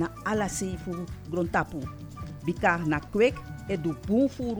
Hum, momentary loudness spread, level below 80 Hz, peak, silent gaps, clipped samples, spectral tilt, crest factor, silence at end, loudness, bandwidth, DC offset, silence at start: none; 12 LU; -48 dBFS; -10 dBFS; none; under 0.1%; -6 dB/octave; 18 dB; 0 s; -28 LUFS; over 20 kHz; under 0.1%; 0 s